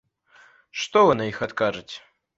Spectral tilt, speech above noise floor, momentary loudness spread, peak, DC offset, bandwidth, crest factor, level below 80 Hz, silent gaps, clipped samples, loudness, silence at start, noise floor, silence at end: -4.5 dB/octave; 33 dB; 20 LU; -4 dBFS; under 0.1%; 8 kHz; 20 dB; -58 dBFS; none; under 0.1%; -22 LUFS; 0.75 s; -56 dBFS; 0.4 s